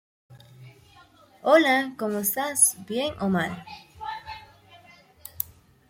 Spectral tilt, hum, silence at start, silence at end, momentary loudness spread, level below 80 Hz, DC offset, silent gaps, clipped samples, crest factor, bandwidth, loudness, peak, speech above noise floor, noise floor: -3 dB/octave; none; 0.3 s; 0.45 s; 23 LU; -62 dBFS; under 0.1%; none; under 0.1%; 22 dB; 16.5 kHz; -23 LUFS; -6 dBFS; 31 dB; -55 dBFS